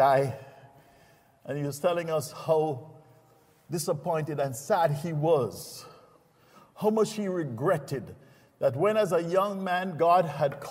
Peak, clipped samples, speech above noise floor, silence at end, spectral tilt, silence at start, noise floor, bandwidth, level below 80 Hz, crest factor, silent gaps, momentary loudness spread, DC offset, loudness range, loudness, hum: -10 dBFS; under 0.1%; 34 dB; 0 s; -6 dB/octave; 0 s; -61 dBFS; 16 kHz; -70 dBFS; 18 dB; none; 13 LU; under 0.1%; 5 LU; -28 LUFS; none